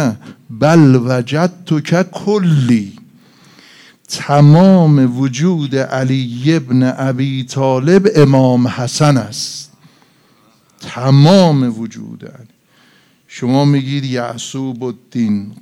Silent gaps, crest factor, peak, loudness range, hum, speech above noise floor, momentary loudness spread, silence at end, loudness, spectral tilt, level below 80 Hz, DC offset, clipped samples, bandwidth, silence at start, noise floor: none; 14 dB; 0 dBFS; 5 LU; none; 39 dB; 16 LU; 0.1 s; -13 LUFS; -7 dB/octave; -56 dBFS; under 0.1%; 0.3%; 12 kHz; 0 s; -51 dBFS